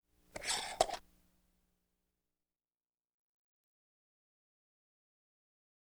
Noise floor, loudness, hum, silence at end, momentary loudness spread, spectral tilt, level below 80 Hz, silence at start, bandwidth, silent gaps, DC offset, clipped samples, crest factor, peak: under -90 dBFS; -37 LUFS; 60 Hz at -95 dBFS; 5 s; 13 LU; -0.5 dB/octave; -68 dBFS; 0.35 s; over 20 kHz; none; under 0.1%; under 0.1%; 34 dB; -14 dBFS